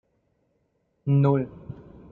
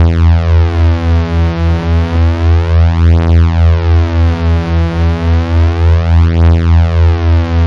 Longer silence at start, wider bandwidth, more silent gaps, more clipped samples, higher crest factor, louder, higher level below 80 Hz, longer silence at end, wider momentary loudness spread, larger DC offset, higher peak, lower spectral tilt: first, 1.05 s vs 0 s; second, 4.2 kHz vs 6 kHz; neither; neither; first, 18 dB vs 8 dB; second, -23 LUFS vs -10 LUFS; second, -60 dBFS vs -18 dBFS; first, 0.4 s vs 0 s; first, 22 LU vs 4 LU; second, under 0.1% vs 0.7%; second, -8 dBFS vs 0 dBFS; first, -12 dB/octave vs -8.5 dB/octave